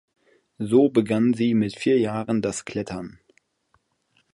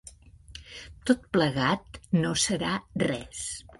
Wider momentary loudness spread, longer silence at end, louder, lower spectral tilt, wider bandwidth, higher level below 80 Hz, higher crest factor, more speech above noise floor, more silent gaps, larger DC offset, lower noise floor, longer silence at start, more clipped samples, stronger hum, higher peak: second, 15 LU vs 19 LU; first, 1.25 s vs 0.2 s; first, -22 LUFS vs -28 LUFS; first, -6.5 dB/octave vs -4 dB/octave; about the same, 11.5 kHz vs 11.5 kHz; second, -60 dBFS vs -52 dBFS; about the same, 18 dB vs 20 dB; first, 46 dB vs 22 dB; neither; neither; first, -68 dBFS vs -50 dBFS; first, 0.6 s vs 0.05 s; neither; neither; about the same, -6 dBFS vs -8 dBFS